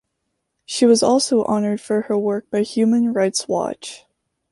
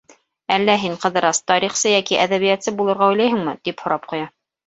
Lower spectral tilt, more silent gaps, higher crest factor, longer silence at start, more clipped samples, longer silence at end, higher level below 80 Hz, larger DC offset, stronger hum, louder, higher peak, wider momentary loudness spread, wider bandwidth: first, -4.5 dB/octave vs -3 dB/octave; neither; about the same, 16 dB vs 18 dB; first, 0.7 s vs 0.5 s; neither; first, 0.55 s vs 0.4 s; about the same, -62 dBFS vs -62 dBFS; neither; neither; about the same, -19 LUFS vs -18 LUFS; about the same, -4 dBFS vs -2 dBFS; about the same, 11 LU vs 10 LU; first, 11.5 kHz vs 8.2 kHz